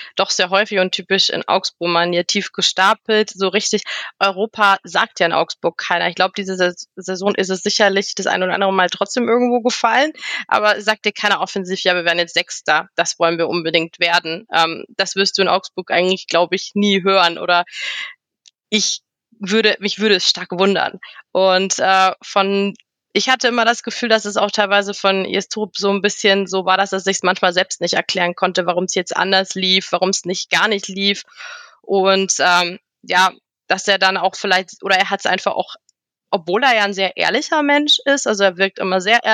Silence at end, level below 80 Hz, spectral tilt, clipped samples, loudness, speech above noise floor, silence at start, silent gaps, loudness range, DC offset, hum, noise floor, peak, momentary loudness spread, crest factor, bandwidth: 0 s; -76 dBFS; -2.5 dB/octave; under 0.1%; -16 LUFS; 38 dB; 0 s; none; 2 LU; under 0.1%; none; -55 dBFS; -2 dBFS; 7 LU; 16 dB; 16 kHz